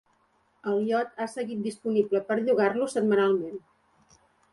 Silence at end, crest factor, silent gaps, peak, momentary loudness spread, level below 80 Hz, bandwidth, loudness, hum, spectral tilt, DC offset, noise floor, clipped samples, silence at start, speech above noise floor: 0.95 s; 18 dB; none; -10 dBFS; 9 LU; -74 dBFS; 11.5 kHz; -27 LUFS; none; -6 dB/octave; under 0.1%; -68 dBFS; under 0.1%; 0.65 s; 42 dB